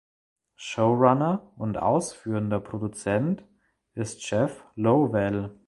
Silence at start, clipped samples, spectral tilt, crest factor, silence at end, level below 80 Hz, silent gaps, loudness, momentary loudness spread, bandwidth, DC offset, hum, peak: 0.6 s; under 0.1%; -6.5 dB/octave; 22 dB; 0.15 s; -56 dBFS; none; -26 LUFS; 13 LU; 11.5 kHz; under 0.1%; none; -4 dBFS